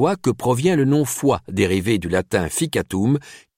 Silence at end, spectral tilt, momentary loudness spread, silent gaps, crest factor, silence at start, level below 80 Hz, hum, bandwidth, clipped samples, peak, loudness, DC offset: 0.2 s; -5.5 dB/octave; 4 LU; none; 14 dB; 0 s; -46 dBFS; none; 16.5 kHz; under 0.1%; -6 dBFS; -20 LUFS; under 0.1%